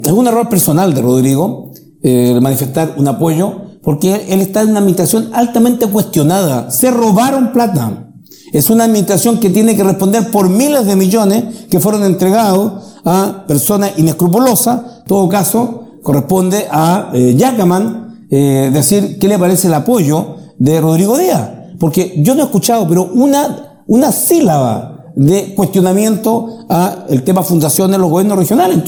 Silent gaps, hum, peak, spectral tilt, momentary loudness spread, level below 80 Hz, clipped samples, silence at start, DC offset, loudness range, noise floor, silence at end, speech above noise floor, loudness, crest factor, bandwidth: none; none; 0 dBFS; -6 dB/octave; 6 LU; -48 dBFS; under 0.1%; 0 s; 0.1%; 2 LU; -36 dBFS; 0 s; 26 dB; -11 LUFS; 10 dB; 19.5 kHz